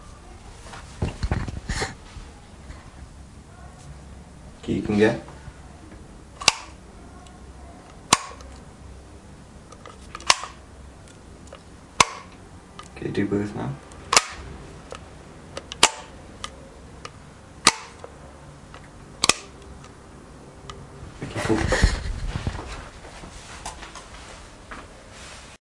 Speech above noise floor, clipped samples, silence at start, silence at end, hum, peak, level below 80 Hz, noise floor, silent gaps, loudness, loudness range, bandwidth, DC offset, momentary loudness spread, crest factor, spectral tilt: 22 dB; under 0.1%; 0 s; 0.05 s; none; 0 dBFS; -38 dBFS; -45 dBFS; none; -24 LUFS; 8 LU; 12 kHz; under 0.1%; 24 LU; 30 dB; -3 dB/octave